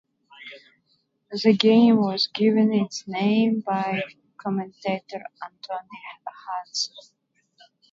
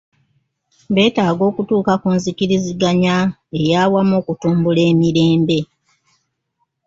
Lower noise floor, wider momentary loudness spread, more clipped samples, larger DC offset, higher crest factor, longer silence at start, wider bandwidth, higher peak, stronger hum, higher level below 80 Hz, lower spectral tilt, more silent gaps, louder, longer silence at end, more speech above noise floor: about the same, -69 dBFS vs -70 dBFS; first, 22 LU vs 5 LU; neither; neither; first, 24 dB vs 14 dB; second, 0.4 s vs 0.9 s; about the same, 7.6 kHz vs 7.8 kHz; about the same, 0 dBFS vs -2 dBFS; neither; second, -72 dBFS vs -52 dBFS; about the same, -5.5 dB/octave vs -6.5 dB/octave; neither; second, -23 LUFS vs -16 LUFS; second, 0.9 s vs 1.2 s; second, 46 dB vs 55 dB